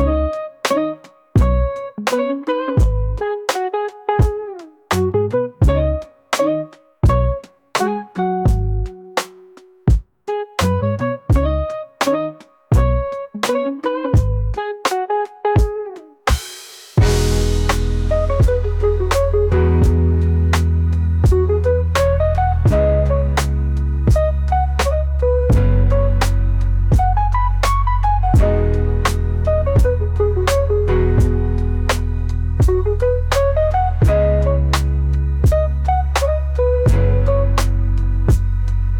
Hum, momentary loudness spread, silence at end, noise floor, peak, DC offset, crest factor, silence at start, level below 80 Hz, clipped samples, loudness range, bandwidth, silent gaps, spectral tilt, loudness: none; 7 LU; 0 s; -44 dBFS; -4 dBFS; under 0.1%; 12 dB; 0 s; -20 dBFS; under 0.1%; 4 LU; 18 kHz; none; -6.5 dB/octave; -18 LUFS